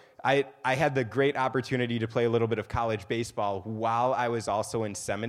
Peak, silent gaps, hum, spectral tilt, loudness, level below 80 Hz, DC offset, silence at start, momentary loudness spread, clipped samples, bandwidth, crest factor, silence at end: -10 dBFS; none; none; -5.5 dB/octave; -28 LUFS; -56 dBFS; under 0.1%; 0.25 s; 6 LU; under 0.1%; 14 kHz; 18 dB; 0 s